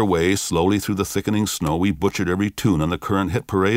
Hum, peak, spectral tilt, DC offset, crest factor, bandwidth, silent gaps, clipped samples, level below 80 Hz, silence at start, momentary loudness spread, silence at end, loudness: none; -6 dBFS; -5.5 dB/octave; under 0.1%; 14 dB; 16 kHz; none; under 0.1%; -42 dBFS; 0 s; 3 LU; 0 s; -21 LUFS